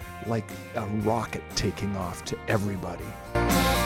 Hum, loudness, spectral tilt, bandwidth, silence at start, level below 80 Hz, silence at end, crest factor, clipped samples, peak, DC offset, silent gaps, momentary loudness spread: none; -29 LUFS; -5 dB/octave; 17 kHz; 0 s; -40 dBFS; 0 s; 18 dB; under 0.1%; -10 dBFS; under 0.1%; none; 10 LU